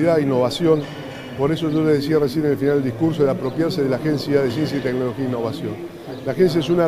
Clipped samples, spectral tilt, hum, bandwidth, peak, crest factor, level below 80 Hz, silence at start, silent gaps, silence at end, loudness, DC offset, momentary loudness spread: under 0.1%; -7 dB/octave; none; 15.5 kHz; -4 dBFS; 16 dB; -52 dBFS; 0 s; none; 0 s; -20 LUFS; under 0.1%; 11 LU